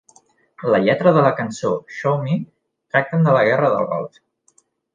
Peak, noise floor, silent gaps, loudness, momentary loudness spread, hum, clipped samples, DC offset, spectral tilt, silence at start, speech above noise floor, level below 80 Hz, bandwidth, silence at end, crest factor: -2 dBFS; -60 dBFS; none; -18 LUFS; 11 LU; none; under 0.1%; under 0.1%; -7 dB/octave; 0.6 s; 43 dB; -64 dBFS; 9.2 kHz; 0.9 s; 18 dB